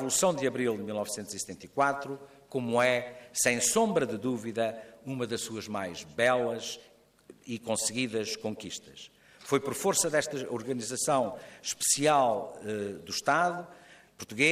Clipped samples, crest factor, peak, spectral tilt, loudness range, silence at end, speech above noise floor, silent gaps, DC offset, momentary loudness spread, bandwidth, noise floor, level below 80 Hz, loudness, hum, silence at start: under 0.1%; 20 dB; -10 dBFS; -3 dB/octave; 4 LU; 0 s; 27 dB; none; under 0.1%; 15 LU; 15 kHz; -57 dBFS; -70 dBFS; -30 LUFS; none; 0 s